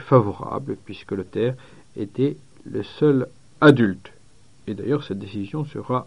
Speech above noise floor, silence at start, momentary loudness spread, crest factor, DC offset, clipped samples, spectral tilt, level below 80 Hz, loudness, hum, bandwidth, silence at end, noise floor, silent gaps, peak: 33 dB; 0 s; 18 LU; 22 dB; 0.3%; under 0.1%; -8.5 dB/octave; -58 dBFS; -22 LUFS; none; 10.5 kHz; 0 s; -55 dBFS; none; 0 dBFS